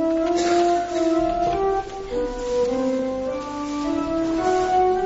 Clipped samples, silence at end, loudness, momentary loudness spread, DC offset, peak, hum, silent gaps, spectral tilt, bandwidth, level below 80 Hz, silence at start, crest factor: under 0.1%; 0 s; -22 LUFS; 8 LU; under 0.1%; -10 dBFS; 50 Hz at -45 dBFS; none; -4 dB/octave; 8 kHz; -42 dBFS; 0 s; 12 dB